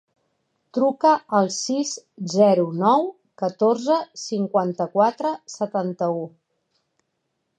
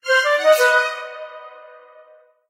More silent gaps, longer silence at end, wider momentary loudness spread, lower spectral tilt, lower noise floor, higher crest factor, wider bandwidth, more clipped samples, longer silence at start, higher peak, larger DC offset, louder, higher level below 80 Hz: neither; first, 1.3 s vs 0.9 s; second, 11 LU vs 22 LU; first, -5.5 dB/octave vs 2 dB/octave; first, -75 dBFS vs -50 dBFS; about the same, 18 dB vs 18 dB; second, 9.4 kHz vs 16 kHz; neither; first, 0.75 s vs 0.05 s; about the same, -4 dBFS vs -2 dBFS; neither; second, -22 LUFS vs -16 LUFS; about the same, -78 dBFS vs -80 dBFS